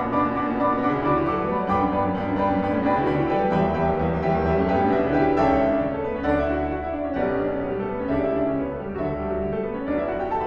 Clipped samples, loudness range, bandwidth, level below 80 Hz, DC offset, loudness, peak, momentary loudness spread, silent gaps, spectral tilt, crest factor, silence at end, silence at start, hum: under 0.1%; 4 LU; 6.6 kHz; -40 dBFS; under 0.1%; -23 LUFS; -8 dBFS; 6 LU; none; -9 dB/octave; 14 dB; 0 s; 0 s; none